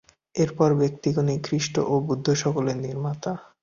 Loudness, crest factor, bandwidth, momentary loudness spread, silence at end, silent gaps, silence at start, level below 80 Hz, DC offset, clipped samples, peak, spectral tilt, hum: -25 LUFS; 18 dB; 7.4 kHz; 8 LU; 0.2 s; none; 0.35 s; -58 dBFS; under 0.1%; under 0.1%; -6 dBFS; -6 dB/octave; none